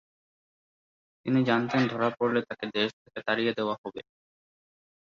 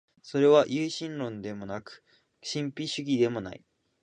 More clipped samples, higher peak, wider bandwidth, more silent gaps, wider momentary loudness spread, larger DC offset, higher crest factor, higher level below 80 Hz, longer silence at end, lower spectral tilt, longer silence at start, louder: neither; about the same, -10 dBFS vs -8 dBFS; second, 7.2 kHz vs 9.6 kHz; first, 2.93-3.05 s, 3.78-3.84 s vs none; second, 12 LU vs 17 LU; neither; about the same, 20 dB vs 22 dB; about the same, -70 dBFS vs -68 dBFS; first, 1.05 s vs 0.45 s; about the same, -6.5 dB/octave vs -5.5 dB/octave; first, 1.25 s vs 0.25 s; about the same, -28 LUFS vs -28 LUFS